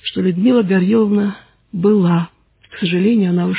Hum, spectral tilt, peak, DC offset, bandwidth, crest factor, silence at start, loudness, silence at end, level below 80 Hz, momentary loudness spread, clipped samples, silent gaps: none; -11.5 dB/octave; -4 dBFS; under 0.1%; 4 kHz; 12 dB; 0.05 s; -15 LUFS; 0 s; -56 dBFS; 9 LU; under 0.1%; none